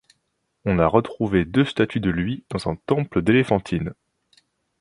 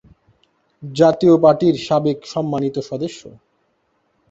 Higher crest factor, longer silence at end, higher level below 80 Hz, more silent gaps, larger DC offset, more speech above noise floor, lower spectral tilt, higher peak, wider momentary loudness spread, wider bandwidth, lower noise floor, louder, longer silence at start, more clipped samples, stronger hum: about the same, 22 dB vs 18 dB; about the same, 0.9 s vs 1 s; first, -44 dBFS vs -58 dBFS; neither; neither; about the same, 52 dB vs 49 dB; about the same, -7.5 dB/octave vs -7 dB/octave; about the same, 0 dBFS vs -2 dBFS; second, 9 LU vs 17 LU; first, 11 kHz vs 8 kHz; first, -73 dBFS vs -65 dBFS; second, -22 LUFS vs -17 LUFS; second, 0.65 s vs 0.8 s; neither; neither